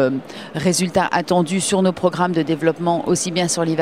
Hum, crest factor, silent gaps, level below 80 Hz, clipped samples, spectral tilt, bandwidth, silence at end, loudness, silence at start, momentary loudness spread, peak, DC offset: none; 16 dB; none; -54 dBFS; under 0.1%; -4.5 dB/octave; 15.5 kHz; 0 s; -19 LUFS; 0 s; 3 LU; -2 dBFS; 0.2%